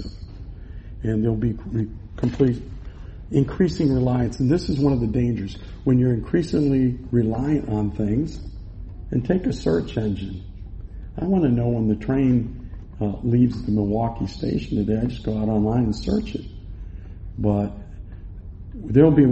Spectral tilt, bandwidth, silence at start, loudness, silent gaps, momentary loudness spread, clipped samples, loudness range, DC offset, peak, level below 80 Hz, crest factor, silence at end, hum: -9 dB/octave; 8.4 kHz; 0 s; -22 LUFS; none; 19 LU; under 0.1%; 4 LU; under 0.1%; -2 dBFS; -36 dBFS; 20 dB; 0 s; none